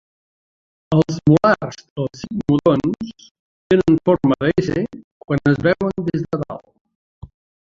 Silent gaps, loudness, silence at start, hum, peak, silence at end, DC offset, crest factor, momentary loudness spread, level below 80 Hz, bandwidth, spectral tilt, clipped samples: 1.90-1.96 s, 3.31-3.70 s, 5.04-5.21 s, 6.81-6.85 s, 6.95-7.21 s; -18 LUFS; 0.9 s; none; -2 dBFS; 0.4 s; under 0.1%; 18 dB; 13 LU; -46 dBFS; 7.6 kHz; -8 dB/octave; under 0.1%